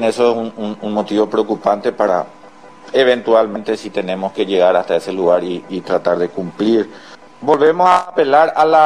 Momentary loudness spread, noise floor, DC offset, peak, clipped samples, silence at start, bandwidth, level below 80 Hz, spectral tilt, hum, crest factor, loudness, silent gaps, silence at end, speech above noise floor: 10 LU; -40 dBFS; 0.4%; 0 dBFS; under 0.1%; 0 s; 10.5 kHz; -62 dBFS; -5.5 dB/octave; none; 16 dB; -16 LUFS; none; 0 s; 25 dB